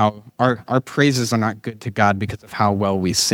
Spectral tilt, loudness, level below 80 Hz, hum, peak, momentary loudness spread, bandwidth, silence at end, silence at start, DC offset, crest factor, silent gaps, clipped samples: -4.5 dB/octave; -20 LUFS; -52 dBFS; none; -2 dBFS; 8 LU; 17.5 kHz; 0 s; 0 s; under 0.1%; 16 dB; none; under 0.1%